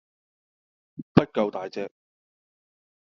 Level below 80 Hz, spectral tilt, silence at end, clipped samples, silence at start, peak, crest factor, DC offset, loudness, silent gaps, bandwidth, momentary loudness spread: -60 dBFS; -6.5 dB/octave; 1.2 s; under 0.1%; 1 s; -2 dBFS; 28 dB; under 0.1%; -26 LUFS; 1.03-1.15 s; 7.2 kHz; 21 LU